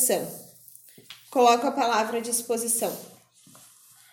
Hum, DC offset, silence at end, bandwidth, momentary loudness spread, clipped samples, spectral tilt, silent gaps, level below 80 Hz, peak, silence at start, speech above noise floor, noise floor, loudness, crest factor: none; under 0.1%; 1.05 s; 17 kHz; 24 LU; under 0.1%; -2 dB/octave; none; -78 dBFS; -8 dBFS; 0 s; 30 dB; -54 dBFS; -24 LUFS; 20 dB